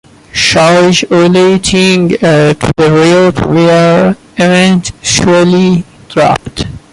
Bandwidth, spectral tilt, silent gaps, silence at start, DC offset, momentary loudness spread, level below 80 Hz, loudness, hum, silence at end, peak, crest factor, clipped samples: 11.5 kHz; -5 dB/octave; none; 0.35 s; under 0.1%; 6 LU; -34 dBFS; -8 LUFS; none; 0.15 s; 0 dBFS; 8 dB; under 0.1%